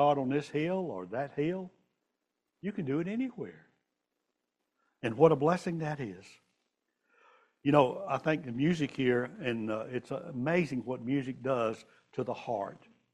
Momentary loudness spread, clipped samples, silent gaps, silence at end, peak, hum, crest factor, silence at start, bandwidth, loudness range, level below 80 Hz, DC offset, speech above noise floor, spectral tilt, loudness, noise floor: 14 LU; under 0.1%; none; 0.35 s; -10 dBFS; none; 22 dB; 0 s; 11 kHz; 7 LU; -70 dBFS; under 0.1%; 53 dB; -7.5 dB/octave; -32 LUFS; -85 dBFS